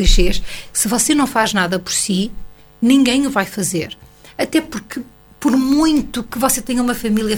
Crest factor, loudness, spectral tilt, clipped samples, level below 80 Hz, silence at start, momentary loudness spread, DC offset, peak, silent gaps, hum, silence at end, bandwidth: 16 dB; -17 LUFS; -3.5 dB/octave; under 0.1%; -26 dBFS; 0 s; 12 LU; under 0.1%; 0 dBFS; none; none; 0 s; 19 kHz